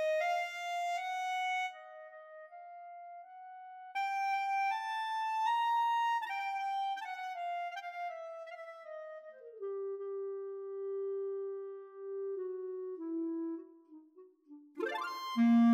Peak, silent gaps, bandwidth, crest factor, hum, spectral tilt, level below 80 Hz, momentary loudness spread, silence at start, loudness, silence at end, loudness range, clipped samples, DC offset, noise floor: -22 dBFS; none; 15 kHz; 14 dB; none; -4.5 dB/octave; under -90 dBFS; 19 LU; 0 s; -37 LUFS; 0 s; 8 LU; under 0.1%; under 0.1%; -60 dBFS